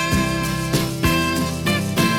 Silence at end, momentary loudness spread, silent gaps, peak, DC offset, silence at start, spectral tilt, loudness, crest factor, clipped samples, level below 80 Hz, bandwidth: 0 s; 3 LU; none; -4 dBFS; under 0.1%; 0 s; -4.5 dB/octave; -20 LUFS; 16 dB; under 0.1%; -34 dBFS; 18 kHz